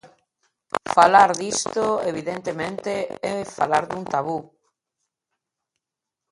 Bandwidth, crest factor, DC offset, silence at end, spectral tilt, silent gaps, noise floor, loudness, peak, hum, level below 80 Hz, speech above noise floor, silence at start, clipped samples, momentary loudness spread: 11.5 kHz; 22 dB; under 0.1%; 1.9 s; -3.5 dB/octave; none; -86 dBFS; -22 LUFS; -2 dBFS; none; -62 dBFS; 65 dB; 0.75 s; under 0.1%; 14 LU